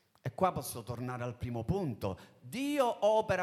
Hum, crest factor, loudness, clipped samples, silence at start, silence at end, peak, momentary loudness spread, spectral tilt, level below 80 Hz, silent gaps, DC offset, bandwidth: none; 18 dB; -34 LUFS; under 0.1%; 0.25 s; 0 s; -16 dBFS; 11 LU; -6 dB/octave; -58 dBFS; none; under 0.1%; 15.5 kHz